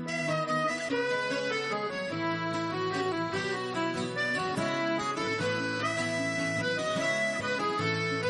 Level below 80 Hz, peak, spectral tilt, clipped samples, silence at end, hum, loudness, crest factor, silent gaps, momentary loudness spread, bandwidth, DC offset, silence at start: -68 dBFS; -16 dBFS; -4.5 dB/octave; under 0.1%; 0 s; none; -30 LUFS; 14 dB; none; 3 LU; 11 kHz; under 0.1%; 0 s